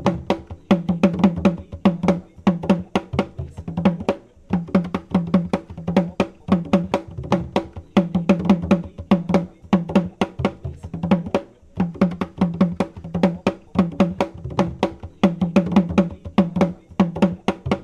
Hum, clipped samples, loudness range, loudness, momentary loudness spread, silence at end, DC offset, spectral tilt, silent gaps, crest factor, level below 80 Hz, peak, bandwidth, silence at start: none; under 0.1%; 2 LU; -21 LUFS; 8 LU; 0 s; under 0.1%; -8 dB/octave; none; 20 dB; -44 dBFS; -2 dBFS; 9.2 kHz; 0 s